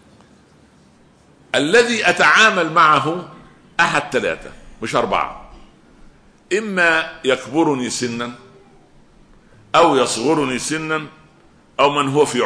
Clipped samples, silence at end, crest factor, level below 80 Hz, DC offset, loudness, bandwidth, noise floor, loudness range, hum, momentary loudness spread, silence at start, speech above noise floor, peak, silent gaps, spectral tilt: under 0.1%; 0 s; 18 dB; -50 dBFS; under 0.1%; -16 LUFS; 11 kHz; -51 dBFS; 6 LU; none; 14 LU; 1.55 s; 34 dB; -2 dBFS; none; -3.5 dB/octave